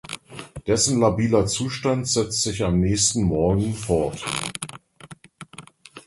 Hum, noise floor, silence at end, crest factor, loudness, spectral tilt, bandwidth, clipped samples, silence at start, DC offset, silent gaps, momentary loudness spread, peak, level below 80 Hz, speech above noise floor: none; -46 dBFS; 0.05 s; 18 dB; -22 LUFS; -4.5 dB/octave; 11.5 kHz; under 0.1%; 0.1 s; under 0.1%; none; 19 LU; -4 dBFS; -40 dBFS; 24 dB